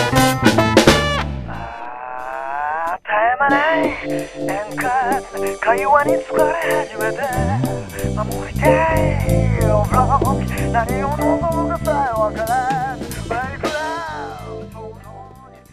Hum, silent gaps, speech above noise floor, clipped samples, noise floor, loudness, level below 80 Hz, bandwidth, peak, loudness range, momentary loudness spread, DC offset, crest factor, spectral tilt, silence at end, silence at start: none; none; 23 dB; under 0.1%; -41 dBFS; -18 LUFS; -32 dBFS; 15.5 kHz; 0 dBFS; 4 LU; 15 LU; 0.7%; 18 dB; -5.5 dB/octave; 0 s; 0 s